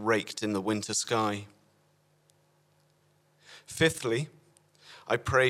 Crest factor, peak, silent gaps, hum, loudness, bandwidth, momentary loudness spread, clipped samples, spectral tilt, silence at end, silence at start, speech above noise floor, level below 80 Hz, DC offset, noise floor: 22 dB; -10 dBFS; none; none; -30 LUFS; 16 kHz; 24 LU; under 0.1%; -4 dB/octave; 0 s; 0 s; 39 dB; -60 dBFS; under 0.1%; -68 dBFS